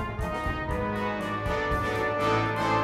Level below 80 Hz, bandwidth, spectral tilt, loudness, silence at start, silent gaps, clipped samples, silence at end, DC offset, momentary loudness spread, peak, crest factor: -40 dBFS; 15.5 kHz; -6 dB/octave; -28 LUFS; 0 s; none; under 0.1%; 0 s; under 0.1%; 5 LU; -14 dBFS; 14 dB